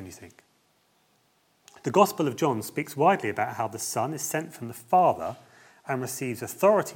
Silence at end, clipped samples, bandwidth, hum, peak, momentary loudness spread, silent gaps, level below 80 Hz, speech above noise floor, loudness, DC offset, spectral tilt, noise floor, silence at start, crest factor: 0 s; under 0.1%; 17.5 kHz; none; -4 dBFS; 16 LU; none; -76 dBFS; 41 dB; -26 LUFS; under 0.1%; -5 dB/octave; -67 dBFS; 0 s; 22 dB